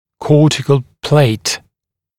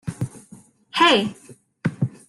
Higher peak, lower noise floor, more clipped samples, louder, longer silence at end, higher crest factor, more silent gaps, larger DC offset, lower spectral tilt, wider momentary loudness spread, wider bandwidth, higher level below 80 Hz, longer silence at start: first, 0 dBFS vs -4 dBFS; first, -78 dBFS vs -49 dBFS; neither; first, -14 LUFS vs -21 LUFS; first, 0.6 s vs 0.2 s; second, 14 dB vs 20 dB; neither; neither; about the same, -5.5 dB/octave vs -5 dB/octave; second, 8 LU vs 15 LU; first, 15 kHz vs 12.5 kHz; first, -50 dBFS vs -58 dBFS; first, 0.2 s vs 0.05 s